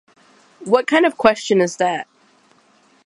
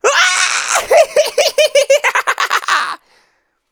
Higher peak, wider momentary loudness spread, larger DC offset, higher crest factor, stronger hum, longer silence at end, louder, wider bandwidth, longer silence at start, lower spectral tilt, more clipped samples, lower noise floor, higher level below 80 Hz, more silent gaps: about the same, 0 dBFS vs 0 dBFS; first, 16 LU vs 5 LU; neither; first, 20 dB vs 14 dB; neither; first, 1.05 s vs 0.75 s; second, -17 LUFS vs -12 LUFS; second, 11.5 kHz vs over 20 kHz; first, 0.6 s vs 0.05 s; first, -4.5 dB/octave vs 2 dB/octave; neither; second, -55 dBFS vs -60 dBFS; about the same, -60 dBFS vs -58 dBFS; neither